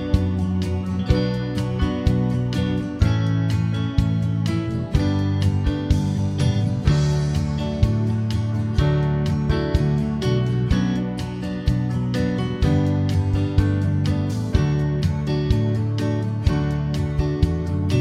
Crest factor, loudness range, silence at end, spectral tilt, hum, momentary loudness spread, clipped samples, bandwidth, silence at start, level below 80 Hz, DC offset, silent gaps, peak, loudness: 18 dB; 1 LU; 0 s; -7.5 dB/octave; none; 3 LU; under 0.1%; 11.5 kHz; 0 s; -30 dBFS; under 0.1%; none; -4 dBFS; -22 LUFS